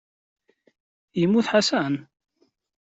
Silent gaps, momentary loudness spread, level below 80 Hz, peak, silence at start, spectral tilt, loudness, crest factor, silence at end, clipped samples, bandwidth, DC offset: none; 12 LU; -68 dBFS; -6 dBFS; 1.15 s; -5 dB/octave; -23 LUFS; 20 dB; 0.9 s; under 0.1%; 8.2 kHz; under 0.1%